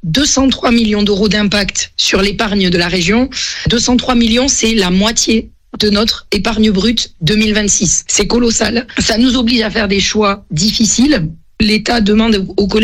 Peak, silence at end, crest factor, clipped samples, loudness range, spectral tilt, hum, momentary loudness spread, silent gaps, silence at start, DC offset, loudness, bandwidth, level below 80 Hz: 0 dBFS; 0 s; 12 dB; under 0.1%; 1 LU; -3.5 dB/octave; none; 4 LU; none; 0.05 s; under 0.1%; -12 LUFS; 15 kHz; -28 dBFS